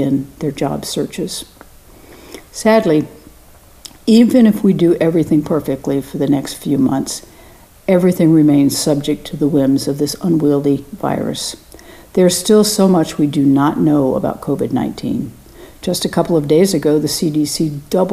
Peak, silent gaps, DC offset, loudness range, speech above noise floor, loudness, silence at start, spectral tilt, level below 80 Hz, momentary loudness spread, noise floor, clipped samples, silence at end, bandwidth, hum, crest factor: 0 dBFS; none; under 0.1%; 3 LU; 29 dB; -15 LUFS; 0 s; -6 dB/octave; -46 dBFS; 12 LU; -43 dBFS; under 0.1%; 0 s; 15.5 kHz; none; 14 dB